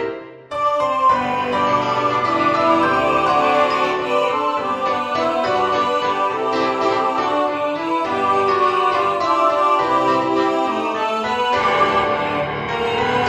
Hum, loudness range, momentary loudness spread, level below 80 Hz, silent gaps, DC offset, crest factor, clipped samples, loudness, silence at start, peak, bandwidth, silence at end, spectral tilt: none; 2 LU; 5 LU; -52 dBFS; none; under 0.1%; 16 dB; under 0.1%; -18 LUFS; 0 s; -2 dBFS; 12.5 kHz; 0 s; -5 dB/octave